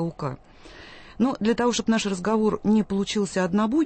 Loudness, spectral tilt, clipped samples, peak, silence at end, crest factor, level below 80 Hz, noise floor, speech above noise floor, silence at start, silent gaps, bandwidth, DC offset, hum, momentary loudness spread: -24 LUFS; -5.5 dB/octave; under 0.1%; -10 dBFS; 0 s; 14 dB; -52 dBFS; -45 dBFS; 22 dB; 0 s; none; 8.8 kHz; under 0.1%; none; 18 LU